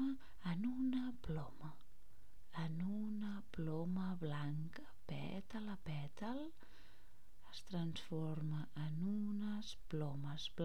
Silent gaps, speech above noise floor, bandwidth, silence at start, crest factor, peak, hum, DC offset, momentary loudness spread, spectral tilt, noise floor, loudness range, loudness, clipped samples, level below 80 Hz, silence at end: none; 23 dB; 14.5 kHz; 0 s; 16 dB; -28 dBFS; none; 0.6%; 10 LU; -7 dB/octave; -67 dBFS; 4 LU; -45 LUFS; under 0.1%; -64 dBFS; 0 s